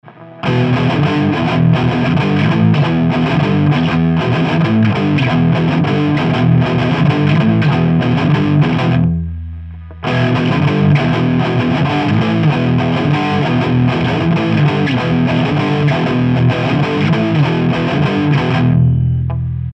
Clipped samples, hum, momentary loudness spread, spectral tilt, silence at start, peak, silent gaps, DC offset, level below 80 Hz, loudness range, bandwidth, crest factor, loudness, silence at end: under 0.1%; none; 3 LU; -8 dB/octave; 0.05 s; 0 dBFS; none; under 0.1%; -36 dBFS; 2 LU; 7.6 kHz; 12 dB; -13 LUFS; 0 s